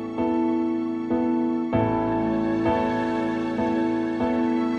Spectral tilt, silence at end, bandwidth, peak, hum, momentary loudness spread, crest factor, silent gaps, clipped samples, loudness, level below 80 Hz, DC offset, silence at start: -8 dB/octave; 0 s; 7.2 kHz; -10 dBFS; none; 3 LU; 12 dB; none; under 0.1%; -24 LUFS; -50 dBFS; under 0.1%; 0 s